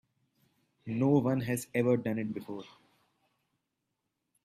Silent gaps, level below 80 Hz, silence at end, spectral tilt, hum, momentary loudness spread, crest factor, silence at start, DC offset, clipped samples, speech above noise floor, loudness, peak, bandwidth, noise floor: none; -70 dBFS; 1.75 s; -7 dB/octave; none; 17 LU; 20 dB; 0.85 s; under 0.1%; under 0.1%; 54 dB; -31 LUFS; -14 dBFS; 15.5 kHz; -84 dBFS